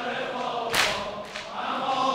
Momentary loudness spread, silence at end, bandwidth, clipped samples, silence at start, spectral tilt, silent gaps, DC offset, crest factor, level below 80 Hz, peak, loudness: 11 LU; 0 s; 16 kHz; under 0.1%; 0 s; -2 dB/octave; none; under 0.1%; 22 dB; -58 dBFS; -6 dBFS; -27 LUFS